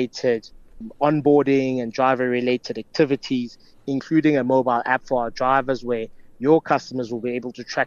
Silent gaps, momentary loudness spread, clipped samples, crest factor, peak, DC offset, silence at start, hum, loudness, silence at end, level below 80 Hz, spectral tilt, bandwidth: none; 10 LU; under 0.1%; 16 dB; -6 dBFS; under 0.1%; 0 s; none; -21 LUFS; 0 s; -52 dBFS; -6.5 dB/octave; 7.2 kHz